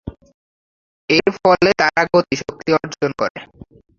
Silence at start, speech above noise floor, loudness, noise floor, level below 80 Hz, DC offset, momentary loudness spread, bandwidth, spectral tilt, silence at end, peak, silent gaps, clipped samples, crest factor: 0.05 s; over 73 dB; -17 LUFS; under -90 dBFS; -48 dBFS; under 0.1%; 14 LU; 7.4 kHz; -5 dB/octave; 0.55 s; -2 dBFS; 0.34-1.08 s, 3.30-3.35 s; under 0.1%; 18 dB